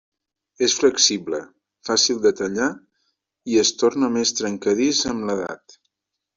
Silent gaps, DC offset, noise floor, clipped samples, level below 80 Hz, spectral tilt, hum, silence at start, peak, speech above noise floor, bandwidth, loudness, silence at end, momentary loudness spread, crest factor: none; under 0.1%; -82 dBFS; under 0.1%; -60 dBFS; -2 dB/octave; none; 0.6 s; -2 dBFS; 62 dB; 7.8 kHz; -20 LUFS; 0.8 s; 13 LU; 20 dB